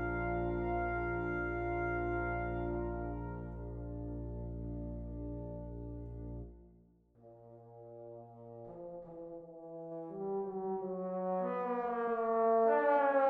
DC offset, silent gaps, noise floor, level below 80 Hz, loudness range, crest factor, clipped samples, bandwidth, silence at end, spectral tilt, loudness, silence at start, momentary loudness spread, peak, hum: under 0.1%; none; -65 dBFS; -48 dBFS; 15 LU; 18 dB; under 0.1%; 4.4 kHz; 0 s; -10.5 dB/octave; -37 LUFS; 0 s; 20 LU; -20 dBFS; none